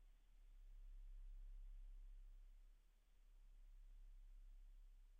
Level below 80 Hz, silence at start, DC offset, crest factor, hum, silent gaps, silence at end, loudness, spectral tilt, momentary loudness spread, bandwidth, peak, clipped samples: -60 dBFS; 0 s; under 0.1%; 8 dB; none; none; 0 s; -66 LUFS; -7 dB/octave; 5 LU; 3.8 kHz; -52 dBFS; under 0.1%